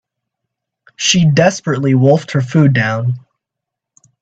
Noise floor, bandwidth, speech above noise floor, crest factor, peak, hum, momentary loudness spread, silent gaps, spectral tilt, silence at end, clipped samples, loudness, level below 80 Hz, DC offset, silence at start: -81 dBFS; 8 kHz; 69 dB; 14 dB; 0 dBFS; none; 8 LU; none; -5 dB/octave; 1.05 s; under 0.1%; -13 LUFS; -52 dBFS; under 0.1%; 1 s